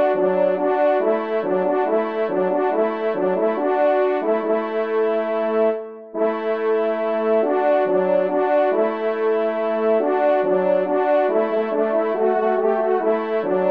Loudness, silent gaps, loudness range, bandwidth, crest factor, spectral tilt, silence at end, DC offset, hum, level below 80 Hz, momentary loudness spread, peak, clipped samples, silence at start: -20 LUFS; none; 2 LU; 5.2 kHz; 12 dB; -8.5 dB/octave; 0 s; 0.2%; none; -72 dBFS; 4 LU; -8 dBFS; under 0.1%; 0 s